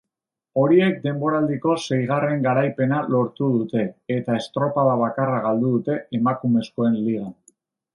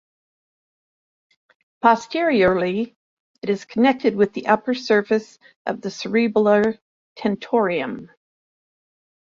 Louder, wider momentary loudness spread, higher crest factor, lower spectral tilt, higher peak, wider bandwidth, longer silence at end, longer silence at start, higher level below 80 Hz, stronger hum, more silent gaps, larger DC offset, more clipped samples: about the same, -21 LUFS vs -20 LUFS; second, 7 LU vs 12 LU; about the same, 16 dB vs 20 dB; first, -7.5 dB/octave vs -6 dB/octave; about the same, -4 dBFS vs -2 dBFS; first, 10.5 kHz vs 7.6 kHz; second, 0.6 s vs 1.2 s; second, 0.55 s vs 1.85 s; second, -66 dBFS vs -60 dBFS; neither; second, none vs 2.96-3.34 s, 5.56-5.65 s, 6.82-7.16 s; neither; neither